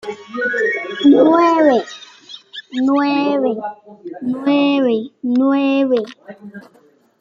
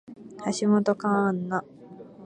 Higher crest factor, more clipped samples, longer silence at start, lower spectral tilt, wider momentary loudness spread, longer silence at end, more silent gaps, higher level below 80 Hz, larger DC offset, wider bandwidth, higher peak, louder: about the same, 14 dB vs 18 dB; neither; about the same, 0.05 s vs 0.1 s; about the same, -5.5 dB/octave vs -6 dB/octave; about the same, 23 LU vs 23 LU; first, 0.6 s vs 0 s; neither; about the same, -66 dBFS vs -70 dBFS; neither; second, 7.4 kHz vs 9.8 kHz; first, -2 dBFS vs -10 dBFS; first, -16 LUFS vs -26 LUFS